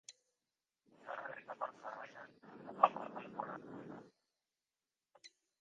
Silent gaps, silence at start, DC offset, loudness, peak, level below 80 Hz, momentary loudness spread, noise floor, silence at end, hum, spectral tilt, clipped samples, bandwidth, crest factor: none; 0.1 s; under 0.1%; -41 LUFS; -12 dBFS; under -90 dBFS; 26 LU; under -90 dBFS; 0.3 s; none; -4.5 dB/octave; under 0.1%; 9.4 kHz; 34 dB